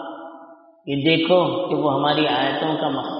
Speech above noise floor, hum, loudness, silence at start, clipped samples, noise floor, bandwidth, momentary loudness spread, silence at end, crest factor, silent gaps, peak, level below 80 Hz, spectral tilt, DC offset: 26 dB; none; -20 LUFS; 0 s; under 0.1%; -46 dBFS; 5.4 kHz; 19 LU; 0 s; 18 dB; none; -4 dBFS; -64 dBFS; -3.5 dB/octave; under 0.1%